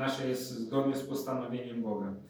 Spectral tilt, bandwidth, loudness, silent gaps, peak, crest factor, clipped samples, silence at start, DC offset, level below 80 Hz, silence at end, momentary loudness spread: -5.5 dB/octave; over 20 kHz; -34 LUFS; none; -18 dBFS; 16 dB; under 0.1%; 0 s; under 0.1%; -78 dBFS; 0 s; 5 LU